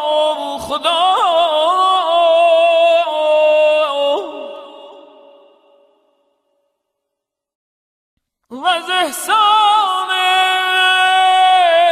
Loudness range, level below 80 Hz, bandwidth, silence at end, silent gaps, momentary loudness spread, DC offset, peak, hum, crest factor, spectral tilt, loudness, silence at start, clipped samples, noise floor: 12 LU; -60 dBFS; 15.5 kHz; 0 s; 7.55-8.17 s; 8 LU; under 0.1%; -4 dBFS; none; 12 dB; -0.5 dB/octave; -13 LUFS; 0 s; under 0.1%; -79 dBFS